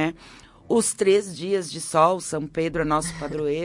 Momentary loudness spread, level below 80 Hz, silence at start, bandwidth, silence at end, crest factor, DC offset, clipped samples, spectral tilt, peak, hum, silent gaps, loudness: 8 LU; -50 dBFS; 0 s; 11.5 kHz; 0 s; 18 dB; under 0.1%; under 0.1%; -4.5 dB/octave; -6 dBFS; none; none; -23 LUFS